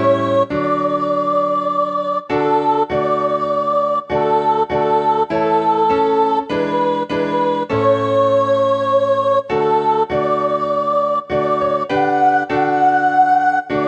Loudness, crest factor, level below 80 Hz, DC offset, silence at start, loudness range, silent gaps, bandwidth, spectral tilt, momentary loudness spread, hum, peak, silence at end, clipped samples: -16 LUFS; 12 dB; -50 dBFS; under 0.1%; 0 s; 1 LU; none; 8.4 kHz; -7 dB/octave; 4 LU; none; -4 dBFS; 0 s; under 0.1%